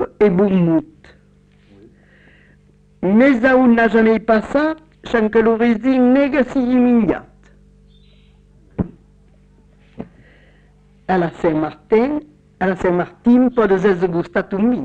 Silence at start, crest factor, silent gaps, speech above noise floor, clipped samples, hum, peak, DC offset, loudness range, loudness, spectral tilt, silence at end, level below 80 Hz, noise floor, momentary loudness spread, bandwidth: 0 s; 14 dB; none; 36 dB; under 0.1%; 50 Hz at -50 dBFS; -4 dBFS; under 0.1%; 13 LU; -16 LUFS; -8.5 dB/octave; 0 s; -44 dBFS; -51 dBFS; 14 LU; 7.8 kHz